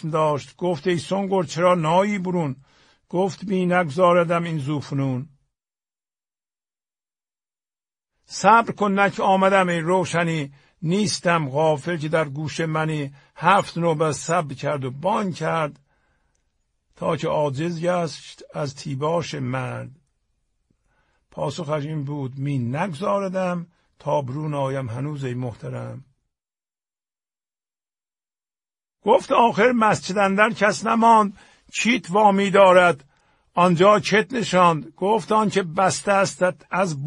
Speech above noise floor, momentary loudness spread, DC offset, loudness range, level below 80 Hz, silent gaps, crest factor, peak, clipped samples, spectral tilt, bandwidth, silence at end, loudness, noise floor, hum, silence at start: over 69 dB; 13 LU; under 0.1%; 12 LU; -62 dBFS; none; 22 dB; 0 dBFS; under 0.1%; -5.5 dB/octave; 11 kHz; 0 s; -21 LUFS; under -90 dBFS; none; 0.05 s